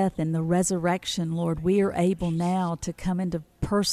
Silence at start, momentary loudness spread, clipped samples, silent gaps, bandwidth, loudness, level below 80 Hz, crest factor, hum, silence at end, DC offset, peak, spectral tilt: 0 s; 6 LU; under 0.1%; none; 14 kHz; -26 LUFS; -46 dBFS; 14 dB; none; 0 s; under 0.1%; -12 dBFS; -5.5 dB/octave